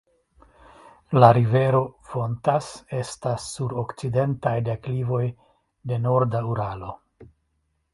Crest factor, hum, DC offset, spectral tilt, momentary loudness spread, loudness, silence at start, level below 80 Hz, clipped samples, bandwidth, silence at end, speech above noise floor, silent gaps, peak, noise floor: 24 dB; none; under 0.1%; -7 dB/octave; 14 LU; -23 LUFS; 1.1 s; -54 dBFS; under 0.1%; 11.5 kHz; 0.7 s; 50 dB; none; 0 dBFS; -72 dBFS